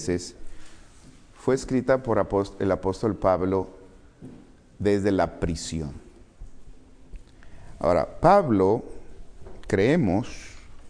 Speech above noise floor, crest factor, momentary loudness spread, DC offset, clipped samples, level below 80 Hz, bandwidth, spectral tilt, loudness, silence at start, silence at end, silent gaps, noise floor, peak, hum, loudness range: 26 dB; 22 dB; 19 LU; under 0.1%; under 0.1%; -44 dBFS; 10.5 kHz; -6.5 dB/octave; -24 LUFS; 0 s; 0 s; none; -49 dBFS; -4 dBFS; none; 6 LU